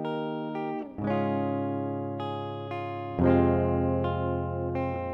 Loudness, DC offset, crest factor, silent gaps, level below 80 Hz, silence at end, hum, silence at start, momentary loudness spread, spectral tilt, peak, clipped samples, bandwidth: -29 LUFS; under 0.1%; 18 dB; none; -48 dBFS; 0 s; none; 0 s; 11 LU; -10.5 dB/octave; -10 dBFS; under 0.1%; 5.6 kHz